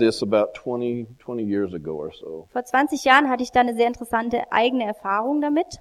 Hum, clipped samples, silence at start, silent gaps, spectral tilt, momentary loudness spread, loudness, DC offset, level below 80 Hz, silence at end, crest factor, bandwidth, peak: none; under 0.1%; 0 s; none; -4.5 dB/octave; 15 LU; -22 LUFS; under 0.1%; -56 dBFS; 0.05 s; 22 dB; 14 kHz; 0 dBFS